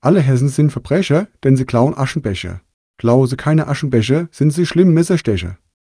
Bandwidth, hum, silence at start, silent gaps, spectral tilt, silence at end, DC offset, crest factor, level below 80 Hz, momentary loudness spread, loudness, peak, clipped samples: 11 kHz; none; 0 s; 2.74-2.94 s; -7 dB/octave; 0.35 s; under 0.1%; 14 dB; -44 dBFS; 9 LU; -15 LUFS; 0 dBFS; under 0.1%